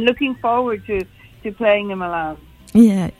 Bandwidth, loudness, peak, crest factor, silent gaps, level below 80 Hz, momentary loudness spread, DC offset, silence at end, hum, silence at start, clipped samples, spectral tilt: 13 kHz; -18 LUFS; 0 dBFS; 18 dB; none; -46 dBFS; 19 LU; under 0.1%; 0.1 s; none; 0 s; under 0.1%; -6.5 dB/octave